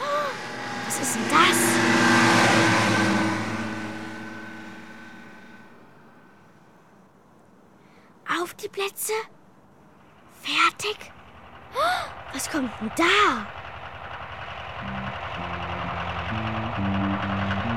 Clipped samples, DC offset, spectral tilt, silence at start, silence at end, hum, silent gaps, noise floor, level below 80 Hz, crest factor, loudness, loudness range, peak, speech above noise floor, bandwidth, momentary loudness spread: under 0.1%; 0.4%; -3.5 dB/octave; 0 s; 0 s; none; none; -55 dBFS; -52 dBFS; 20 dB; -23 LUFS; 17 LU; -6 dBFS; 32 dB; 17.5 kHz; 20 LU